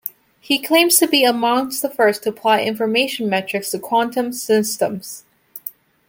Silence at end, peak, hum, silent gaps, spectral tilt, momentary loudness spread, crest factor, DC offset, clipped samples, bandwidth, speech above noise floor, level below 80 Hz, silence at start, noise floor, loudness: 0.4 s; 0 dBFS; none; none; -2.5 dB/octave; 19 LU; 18 dB; under 0.1%; under 0.1%; 17 kHz; 19 dB; -66 dBFS; 0.05 s; -37 dBFS; -17 LUFS